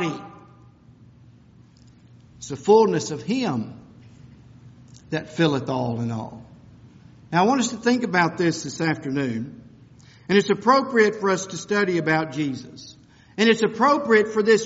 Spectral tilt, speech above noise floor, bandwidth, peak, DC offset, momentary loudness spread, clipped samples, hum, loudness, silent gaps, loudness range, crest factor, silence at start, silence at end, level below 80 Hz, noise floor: -4.5 dB/octave; 30 dB; 8 kHz; -4 dBFS; under 0.1%; 17 LU; under 0.1%; none; -22 LUFS; none; 5 LU; 20 dB; 0 s; 0 s; -62 dBFS; -51 dBFS